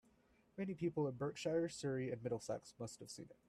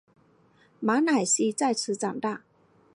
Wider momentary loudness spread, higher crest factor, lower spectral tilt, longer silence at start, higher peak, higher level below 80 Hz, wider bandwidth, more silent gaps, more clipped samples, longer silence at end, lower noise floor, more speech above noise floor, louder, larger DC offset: about the same, 12 LU vs 10 LU; about the same, 16 dB vs 18 dB; first, -6 dB/octave vs -3 dB/octave; second, 0.55 s vs 0.8 s; second, -28 dBFS vs -10 dBFS; about the same, -76 dBFS vs -80 dBFS; first, 13.5 kHz vs 11.5 kHz; neither; neither; second, 0.15 s vs 0.55 s; first, -74 dBFS vs -61 dBFS; second, 31 dB vs 36 dB; second, -43 LUFS vs -26 LUFS; neither